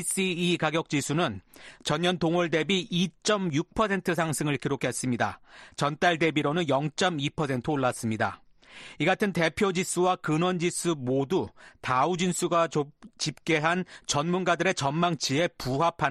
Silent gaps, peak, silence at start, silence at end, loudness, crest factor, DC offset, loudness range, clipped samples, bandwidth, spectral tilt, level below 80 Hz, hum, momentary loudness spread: none; -8 dBFS; 0 s; 0 s; -27 LUFS; 18 dB; under 0.1%; 1 LU; under 0.1%; 13 kHz; -4.5 dB/octave; -58 dBFS; none; 6 LU